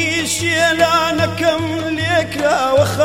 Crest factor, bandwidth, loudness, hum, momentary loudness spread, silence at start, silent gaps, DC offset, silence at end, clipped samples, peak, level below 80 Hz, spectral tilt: 14 dB; 16.5 kHz; -15 LUFS; none; 5 LU; 0 s; none; 0.4%; 0 s; under 0.1%; 0 dBFS; -46 dBFS; -4 dB/octave